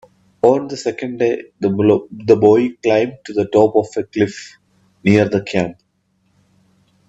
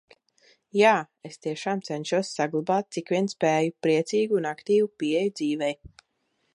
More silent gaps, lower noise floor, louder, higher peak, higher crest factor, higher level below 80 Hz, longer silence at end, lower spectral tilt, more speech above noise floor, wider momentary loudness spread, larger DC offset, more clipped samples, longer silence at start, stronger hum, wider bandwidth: neither; second, -63 dBFS vs -74 dBFS; first, -16 LUFS vs -25 LUFS; first, 0 dBFS vs -6 dBFS; about the same, 16 dB vs 20 dB; first, -56 dBFS vs -66 dBFS; first, 1.35 s vs 0.65 s; first, -7 dB/octave vs -5 dB/octave; about the same, 48 dB vs 49 dB; about the same, 10 LU vs 10 LU; neither; neither; second, 0.45 s vs 0.75 s; neither; second, 8 kHz vs 11 kHz